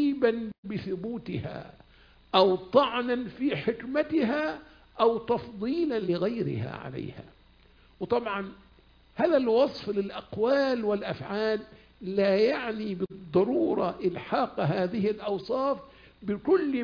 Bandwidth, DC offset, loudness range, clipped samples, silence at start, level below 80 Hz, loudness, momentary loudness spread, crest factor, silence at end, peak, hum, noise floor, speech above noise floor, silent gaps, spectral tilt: 5.2 kHz; under 0.1%; 4 LU; under 0.1%; 0 s; -60 dBFS; -28 LUFS; 12 LU; 22 dB; 0 s; -6 dBFS; none; -58 dBFS; 31 dB; 0.58-0.63 s; -8 dB/octave